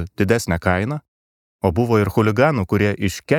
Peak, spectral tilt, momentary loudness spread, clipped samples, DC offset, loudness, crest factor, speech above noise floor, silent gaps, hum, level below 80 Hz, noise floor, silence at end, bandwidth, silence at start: -2 dBFS; -6.5 dB/octave; 7 LU; under 0.1%; under 0.1%; -19 LUFS; 18 dB; over 72 dB; 1.08-1.59 s; none; -42 dBFS; under -90 dBFS; 0 s; 17.5 kHz; 0 s